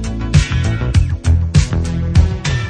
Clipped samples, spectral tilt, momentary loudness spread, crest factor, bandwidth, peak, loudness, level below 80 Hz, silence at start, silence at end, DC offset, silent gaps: under 0.1%; -6 dB/octave; 4 LU; 14 dB; 9.8 kHz; 0 dBFS; -15 LUFS; -18 dBFS; 0 s; 0 s; under 0.1%; none